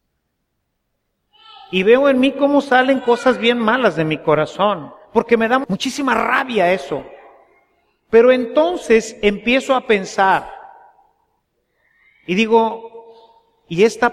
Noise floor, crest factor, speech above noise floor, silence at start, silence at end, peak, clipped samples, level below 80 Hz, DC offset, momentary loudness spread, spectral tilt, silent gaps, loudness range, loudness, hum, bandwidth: -72 dBFS; 16 dB; 56 dB; 1.7 s; 0 s; 0 dBFS; under 0.1%; -52 dBFS; under 0.1%; 9 LU; -5 dB/octave; none; 5 LU; -16 LUFS; none; 13 kHz